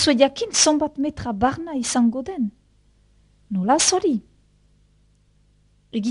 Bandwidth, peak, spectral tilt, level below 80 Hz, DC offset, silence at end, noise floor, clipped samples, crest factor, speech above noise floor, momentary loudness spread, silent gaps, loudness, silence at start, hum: 11 kHz; 0 dBFS; -3 dB/octave; -52 dBFS; under 0.1%; 0 s; -59 dBFS; under 0.1%; 22 dB; 39 dB; 11 LU; none; -21 LUFS; 0 s; none